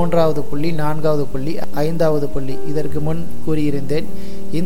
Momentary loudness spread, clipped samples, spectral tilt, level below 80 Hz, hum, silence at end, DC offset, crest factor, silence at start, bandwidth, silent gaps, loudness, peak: 8 LU; under 0.1%; -7.5 dB/octave; -38 dBFS; none; 0 s; 20%; 16 dB; 0 s; 17 kHz; none; -21 LUFS; -2 dBFS